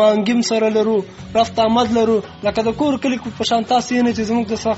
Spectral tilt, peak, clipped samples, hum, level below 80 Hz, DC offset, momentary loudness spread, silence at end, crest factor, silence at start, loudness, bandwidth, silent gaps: -4 dB/octave; -2 dBFS; under 0.1%; none; -48 dBFS; under 0.1%; 6 LU; 0 s; 14 dB; 0 s; -17 LUFS; 8 kHz; none